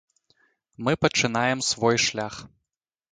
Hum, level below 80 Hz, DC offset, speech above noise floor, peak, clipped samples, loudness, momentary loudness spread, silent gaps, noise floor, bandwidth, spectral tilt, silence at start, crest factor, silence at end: none; -58 dBFS; under 0.1%; 61 dB; -4 dBFS; under 0.1%; -23 LUFS; 12 LU; none; -85 dBFS; 9.6 kHz; -3.5 dB/octave; 0.8 s; 22 dB; 0.65 s